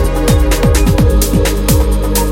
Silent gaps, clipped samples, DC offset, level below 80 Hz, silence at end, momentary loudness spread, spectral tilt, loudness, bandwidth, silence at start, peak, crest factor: none; under 0.1%; under 0.1%; -12 dBFS; 0 s; 2 LU; -5.5 dB/octave; -12 LUFS; 17 kHz; 0 s; 0 dBFS; 10 dB